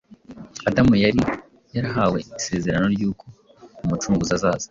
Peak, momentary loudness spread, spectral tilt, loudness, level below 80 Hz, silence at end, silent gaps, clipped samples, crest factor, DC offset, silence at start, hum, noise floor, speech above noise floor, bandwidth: -4 dBFS; 14 LU; -5.5 dB/octave; -22 LUFS; -44 dBFS; 0.05 s; none; under 0.1%; 18 dB; under 0.1%; 0.1 s; none; -47 dBFS; 27 dB; 7.6 kHz